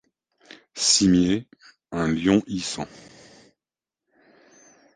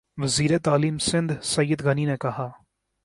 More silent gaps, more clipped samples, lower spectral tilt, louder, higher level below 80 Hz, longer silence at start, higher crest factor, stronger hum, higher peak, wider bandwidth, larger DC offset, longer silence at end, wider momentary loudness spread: neither; neither; second, -3.5 dB/octave vs -5 dB/octave; about the same, -22 LUFS vs -24 LUFS; about the same, -52 dBFS vs -54 dBFS; first, 0.75 s vs 0.15 s; about the same, 20 dB vs 16 dB; neither; about the same, -6 dBFS vs -8 dBFS; second, 10 kHz vs 11.5 kHz; neither; first, 2.1 s vs 0.5 s; first, 17 LU vs 8 LU